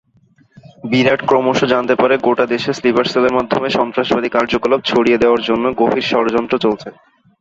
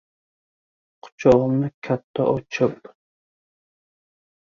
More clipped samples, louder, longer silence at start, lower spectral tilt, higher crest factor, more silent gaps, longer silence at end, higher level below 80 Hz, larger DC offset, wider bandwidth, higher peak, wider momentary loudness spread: neither; first, -15 LUFS vs -21 LUFS; second, 0.85 s vs 1.05 s; second, -5.5 dB/octave vs -7.5 dB/octave; second, 16 dB vs 22 dB; second, none vs 1.12-1.18 s, 1.74-1.82 s, 2.04-2.14 s; second, 0.5 s vs 1.75 s; about the same, -50 dBFS vs -54 dBFS; neither; about the same, 7.8 kHz vs 7.2 kHz; about the same, 0 dBFS vs -2 dBFS; second, 4 LU vs 9 LU